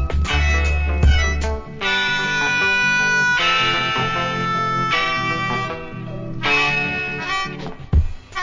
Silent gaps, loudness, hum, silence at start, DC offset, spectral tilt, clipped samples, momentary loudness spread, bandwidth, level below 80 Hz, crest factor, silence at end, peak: none; -18 LUFS; none; 0 s; 0.1%; -4 dB/octave; under 0.1%; 11 LU; 7.6 kHz; -24 dBFS; 16 dB; 0 s; -4 dBFS